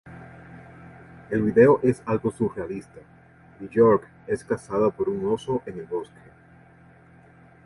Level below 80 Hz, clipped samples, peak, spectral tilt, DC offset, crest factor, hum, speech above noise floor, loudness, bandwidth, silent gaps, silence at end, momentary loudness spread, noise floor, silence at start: -56 dBFS; under 0.1%; -4 dBFS; -8 dB/octave; under 0.1%; 20 dB; none; 29 dB; -23 LUFS; 11.5 kHz; none; 1.6 s; 26 LU; -52 dBFS; 0.05 s